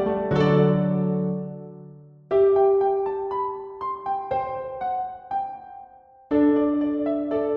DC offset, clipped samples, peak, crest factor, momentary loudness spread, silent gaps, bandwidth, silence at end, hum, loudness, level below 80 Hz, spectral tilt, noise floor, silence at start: under 0.1%; under 0.1%; -8 dBFS; 16 dB; 14 LU; none; 6 kHz; 0 s; none; -23 LUFS; -54 dBFS; -10 dB/octave; -48 dBFS; 0 s